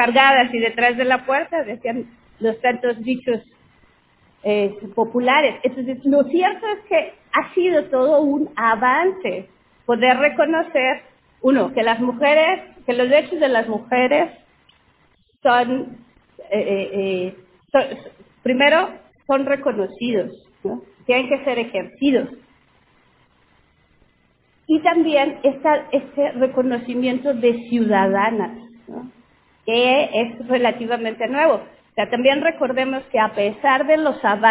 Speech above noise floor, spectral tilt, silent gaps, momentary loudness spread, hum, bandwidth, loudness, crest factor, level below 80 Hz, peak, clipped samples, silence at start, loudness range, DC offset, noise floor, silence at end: 42 dB; -8 dB/octave; none; 11 LU; none; 4 kHz; -19 LUFS; 18 dB; -62 dBFS; 0 dBFS; under 0.1%; 0 s; 5 LU; under 0.1%; -60 dBFS; 0 s